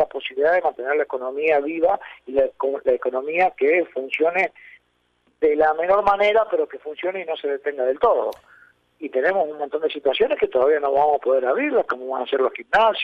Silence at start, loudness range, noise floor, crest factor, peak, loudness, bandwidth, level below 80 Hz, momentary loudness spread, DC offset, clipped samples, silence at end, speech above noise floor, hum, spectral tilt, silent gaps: 0 s; 2 LU; -66 dBFS; 16 dB; -4 dBFS; -21 LUFS; 6.8 kHz; -58 dBFS; 8 LU; under 0.1%; under 0.1%; 0 s; 46 dB; none; -5 dB/octave; none